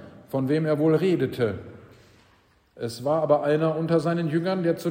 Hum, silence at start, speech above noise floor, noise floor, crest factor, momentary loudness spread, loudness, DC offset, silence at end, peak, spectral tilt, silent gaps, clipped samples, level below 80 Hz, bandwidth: none; 0 s; 37 dB; -61 dBFS; 18 dB; 10 LU; -24 LUFS; under 0.1%; 0 s; -8 dBFS; -7.5 dB/octave; none; under 0.1%; -64 dBFS; 16 kHz